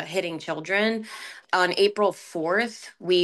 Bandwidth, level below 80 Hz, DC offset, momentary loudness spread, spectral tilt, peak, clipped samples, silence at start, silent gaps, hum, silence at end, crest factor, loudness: 12.5 kHz; -76 dBFS; under 0.1%; 11 LU; -4 dB/octave; -8 dBFS; under 0.1%; 0 s; none; none; 0 s; 18 dB; -25 LUFS